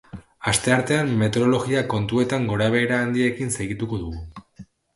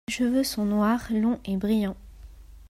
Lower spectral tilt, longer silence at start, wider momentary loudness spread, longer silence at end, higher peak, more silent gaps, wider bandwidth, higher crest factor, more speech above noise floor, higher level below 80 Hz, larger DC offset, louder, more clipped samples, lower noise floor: about the same, -5 dB/octave vs -5.5 dB/octave; about the same, 0.15 s vs 0.1 s; first, 9 LU vs 4 LU; first, 0.3 s vs 0 s; first, -4 dBFS vs -12 dBFS; neither; second, 11.5 kHz vs 15 kHz; about the same, 18 dB vs 14 dB; first, 25 dB vs 21 dB; about the same, -46 dBFS vs -48 dBFS; neither; first, -22 LUFS vs -25 LUFS; neither; about the same, -47 dBFS vs -46 dBFS